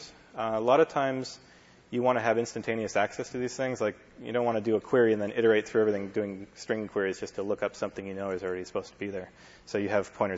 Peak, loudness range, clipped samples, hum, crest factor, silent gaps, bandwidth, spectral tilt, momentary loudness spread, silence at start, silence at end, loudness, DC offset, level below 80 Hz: -10 dBFS; 6 LU; under 0.1%; none; 20 dB; none; 8 kHz; -5.5 dB/octave; 13 LU; 0 s; 0 s; -29 LUFS; under 0.1%; -66 dBFS